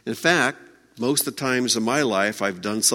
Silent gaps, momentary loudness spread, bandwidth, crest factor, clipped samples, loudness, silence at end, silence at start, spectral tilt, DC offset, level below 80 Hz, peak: none; 6 LU; 16.5 kHz; 22 dB; under 0.1%; -22 LUFS; 0 s; 0.05 s; -2.5 dB/octave; under 0.1%; -66 dBFS; -2 dBFS